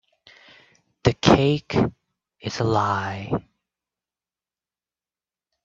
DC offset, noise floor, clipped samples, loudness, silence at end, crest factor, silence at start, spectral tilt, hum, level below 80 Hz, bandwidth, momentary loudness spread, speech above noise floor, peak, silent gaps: under 0.1%; under -90 dBFS; under 0.1%; -22 LUFS; 2.25 s; 26 dB; 1.05 s; -6 dB/octave; none; -48 dBFS; 7.8 kHz; 12 LU; over 67 dB; 0 dBFS; none